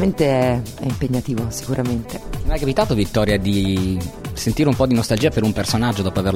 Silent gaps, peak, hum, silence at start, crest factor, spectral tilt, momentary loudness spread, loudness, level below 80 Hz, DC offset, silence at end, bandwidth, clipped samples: none; -2 dBFS; none; 0 s; 16 dB; -6 dB/octave; 8 LU; -20 LUFS; -32 dBFS; under 0.1%; 0 s; 16.5 kHz; under 0.1%